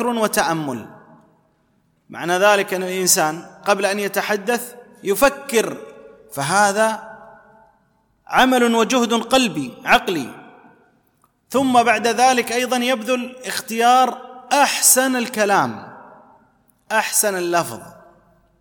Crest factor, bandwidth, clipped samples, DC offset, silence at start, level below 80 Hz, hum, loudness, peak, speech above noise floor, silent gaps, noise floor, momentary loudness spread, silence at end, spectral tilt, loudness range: 18 dB; 19 kHz; under 0.1%; under 0.1%; 0 s; -56 dBFS; none; -18 LUFS; -2 dBFS; 44 dB; none; -62 dBFS; 14 LU; 0.7 s; -2.5 dB/octave; 4 LU